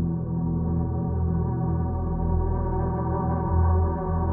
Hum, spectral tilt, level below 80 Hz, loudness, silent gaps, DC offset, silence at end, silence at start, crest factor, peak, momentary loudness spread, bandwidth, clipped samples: none; -14.5 dB/octave; -30 dBFS; -26 LUFS; none; under 0.1%; 0 s; 0 s; 12 dB; -12 dBFS; 4 LU; 1.9 kHz; under 0.1%